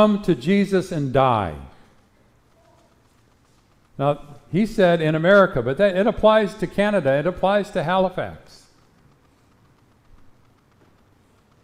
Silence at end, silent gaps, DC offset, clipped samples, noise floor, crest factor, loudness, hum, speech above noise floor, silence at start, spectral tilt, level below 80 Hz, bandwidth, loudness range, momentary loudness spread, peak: 3.25 s; none; under 0.1%; under 0.1%; -58 dBFS; 18 dB; -20 LUFS; none; 39 dB; 0 s; -7 dB/octave; -46 dBFS; 13.5 kHz; 11 LU; 9 LU; -4 dBFS